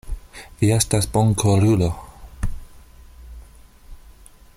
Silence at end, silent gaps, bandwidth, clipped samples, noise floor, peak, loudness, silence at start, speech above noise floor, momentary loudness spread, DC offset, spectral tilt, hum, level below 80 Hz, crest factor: 0.6 s; none; 15.5 kHz; under 0.1%; -46 dBFS; -4 dBFS; -20 LUFS; 0.05 s; 29 dB; 19 LU; under 0.1%; -5.5 dB/octave; none; -36 dBFS; 18 dB